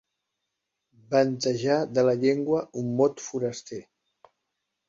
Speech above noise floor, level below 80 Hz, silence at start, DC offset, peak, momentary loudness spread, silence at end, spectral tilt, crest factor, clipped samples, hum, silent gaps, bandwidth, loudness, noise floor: 58 dB; -70 dBFS; 1.1 s; under 0.1%; -8 dBFS; 10 LU; 1.05 s; -5.5 dB/octave; 18 dB; under 0.1%; none; none; 7.8 kHz; -25 LUFS; -82 dBFS